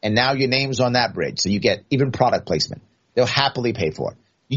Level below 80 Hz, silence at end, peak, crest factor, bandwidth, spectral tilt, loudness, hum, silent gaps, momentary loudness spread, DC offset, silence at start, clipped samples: -54 dBFS; 0 s; 0 dBFS; 20 dB; 8 kHz; -3.5 dB/octave; -20 LUFS; none; none; 7 LU; under 0.1%; 0.05 s; under 0.1%